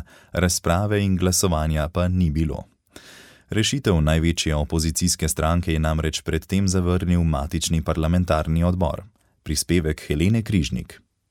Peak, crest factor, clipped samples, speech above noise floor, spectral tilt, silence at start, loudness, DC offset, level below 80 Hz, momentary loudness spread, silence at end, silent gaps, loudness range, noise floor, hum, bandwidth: -6 dBFS; 16 dB; under 0.1%; 26 dB; -5 dB/octave; 0 s; -22 LUFS; under 0.1%; -32 dBFS; 6 LU; 0.35 s; none; 1 LU; -47 dBFS; none; 16.5 kHz